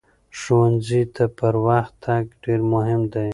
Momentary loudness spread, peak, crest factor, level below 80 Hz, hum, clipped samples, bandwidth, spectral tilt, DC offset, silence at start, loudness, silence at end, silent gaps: 6 LU; -4 dBFS; 16 dB; -50 dBFS; none; under 0.1%; 11 kHz; -8 dB/octave; under 0.1%; 0.35 s; -20 LUFS; 0 s; none